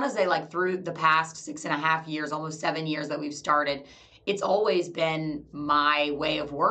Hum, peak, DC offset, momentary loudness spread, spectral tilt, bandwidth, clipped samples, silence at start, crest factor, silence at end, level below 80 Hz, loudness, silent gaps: none; -6 dBFS; under 0.1%; 10 LU; -4.5 dB/octave; 9 kHz; under 0.1%; 0 s; 20 dB; 0 s; -62 dBFS; -27 LUFS; none